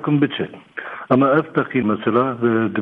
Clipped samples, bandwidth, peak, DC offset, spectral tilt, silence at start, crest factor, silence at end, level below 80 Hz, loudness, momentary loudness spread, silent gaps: under 0.1%; 4.1 kHz; -2 dBFS; under 0.1%; -9.5 dB/octave; 0 s; 16 dB; 0 s; -60 dBFS; -19 LUFS; 14 LU; none